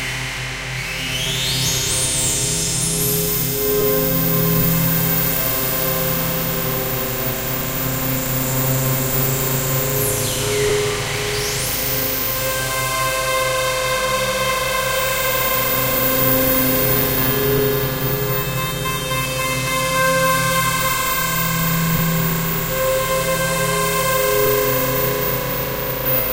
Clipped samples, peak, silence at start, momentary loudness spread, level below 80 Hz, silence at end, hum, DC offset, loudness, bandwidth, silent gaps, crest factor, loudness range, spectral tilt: under 0.1%; -2 dBFS; 0 s; 5 LU; -36 dBFS; 0 s; none; under 0.1%; -18 LUFS; 16 kHz; none; 16 dB; 3 LU; -3.5 dB/octave